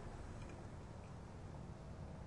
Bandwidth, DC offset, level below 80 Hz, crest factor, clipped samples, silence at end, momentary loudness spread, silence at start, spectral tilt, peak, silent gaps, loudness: 11 kHz; under 0.1%; -58 dBFS; 12 dB; under 0.1%; 0 s; 2 LU; 0 s; -7 dB/octave; -38 dBFS; none; -53 LUFS